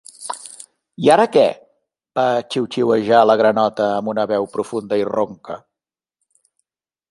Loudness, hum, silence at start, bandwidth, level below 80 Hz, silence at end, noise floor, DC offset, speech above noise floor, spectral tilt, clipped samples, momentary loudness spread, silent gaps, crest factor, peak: -17 LUFS; none; 0.2 s; 11.5 kHz; -64 dBFS; 1.55 s; -87 dBFS; under 0.1%; 71 dB; -5 dB/octave; under 0.1%; 18 LU; none; 18 dB; -2 dBFS